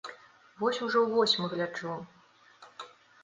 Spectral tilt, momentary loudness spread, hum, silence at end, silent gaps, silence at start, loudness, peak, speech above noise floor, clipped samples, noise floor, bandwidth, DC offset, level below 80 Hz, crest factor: -4 dB/octave; 23 LU; none; 0.35 s; none; 0.05 s; -29 LUFS; -14 dBFS; 28 dB; under 0.1%; -57 dBFS; 9.6 kHz; under 0.1%; -78 dBFS; 20 dB